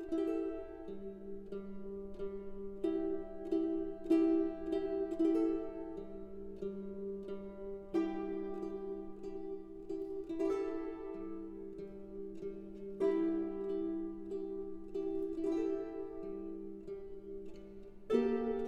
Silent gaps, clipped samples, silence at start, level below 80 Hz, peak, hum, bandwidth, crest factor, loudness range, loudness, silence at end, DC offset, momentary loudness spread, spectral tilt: none; under 0.1%; 0 s; -58 dBFS; -18 dBFS; none; 7.6 kHz; 20 dB; 7 LU; -39 LUFS; 0 s; under 0.1%; 14 LU; -8 dB/octave